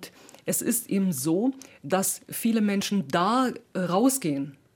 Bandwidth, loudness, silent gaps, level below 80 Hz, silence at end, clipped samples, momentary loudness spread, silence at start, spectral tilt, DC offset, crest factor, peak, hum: 19 kHz; -26 LUFS; none; -72 dBFS; 0.25 s; under 0.1%; 8 LU; 0 s; -4.5 dB/octave; under 0.1%; 18 dB; -10 dBFS; none